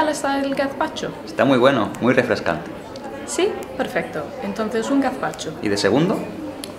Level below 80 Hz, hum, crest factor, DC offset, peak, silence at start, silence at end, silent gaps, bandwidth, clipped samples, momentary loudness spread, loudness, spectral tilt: -52 dBFS; none; 20 dB; under 0.1%; 0 dBFS; 0 s; 0 s; none; 16 kHz; under 0.1%; 11 LU; -21 LUFS; -5 dB/octave